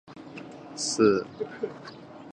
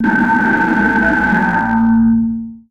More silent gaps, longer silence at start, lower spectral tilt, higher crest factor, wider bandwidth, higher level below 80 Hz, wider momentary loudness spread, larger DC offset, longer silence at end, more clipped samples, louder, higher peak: neither; about the same, 0.1 s vs 0 s; second, -4 dB/octave vs -7.5 dB/octave; first, 22 dB vs 12 dB; first, 10.5 kHz vs 6.8 kHz; second, -68 dBFS vs -36 dBFS; first, 21 LU vs 4 LU; second, under 0.1% vs 0.6%; about the same, 0 s vs 0.1 s; neither; second, -27 LUFS vs -13 LUFS; second, -8 dBFS vs -2 dBFS